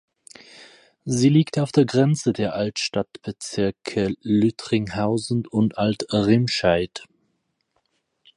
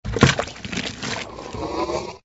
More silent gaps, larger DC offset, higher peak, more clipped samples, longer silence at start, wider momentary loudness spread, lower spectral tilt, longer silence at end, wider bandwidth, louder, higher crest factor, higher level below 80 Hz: neither; neither; second, -4 dBFS vs 0 dBFS; neither; first, 0.6 s vs 0.05 s; about the same, 10 LU vs 12 LU; first, -6 dB/octave vs -4.5 dB/octave; first, 1.3 s vs 0.05 s; first, 11.5 kHz vs 8 kHz; about the same, -22 LUFS vs -24 LUFS; second, 18 dB vs 24 dB; second, -52 dBFS vs -38 dBFS